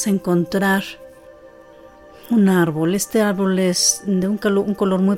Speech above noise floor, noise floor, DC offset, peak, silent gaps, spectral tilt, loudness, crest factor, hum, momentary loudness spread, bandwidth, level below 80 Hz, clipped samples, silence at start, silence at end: 26 dB; -44 dBFS; under 0.1%; -4 dBFS; none; -4.5 dB/octave; -18 LUFS; 14 dB; none; 5 LU; 16.5 kHz; -54 dBFS; under 0.1%; 0 s; 0 s